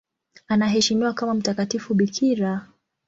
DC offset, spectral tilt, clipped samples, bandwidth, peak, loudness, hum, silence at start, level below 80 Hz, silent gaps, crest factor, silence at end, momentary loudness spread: under 0.1%; -4.5 dB/octave; under 0.1%; 7.8 kHz; -8 dBFS; -22 LUFS; none; 0.5 s; -60 dBFS; none; 16 dB; 0.45 s; 6 LU